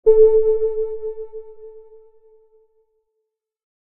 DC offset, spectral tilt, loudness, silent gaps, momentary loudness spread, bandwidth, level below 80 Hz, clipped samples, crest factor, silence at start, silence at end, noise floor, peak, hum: under 0.1%; -9 dB/octave; -18 LUFS; none; 24 LU; 2.3 kHz; -46 dBFS; under 0.1%; 18 dB; 0.05 s; 2.2 s; -77 dBFS; -2 dBFS; none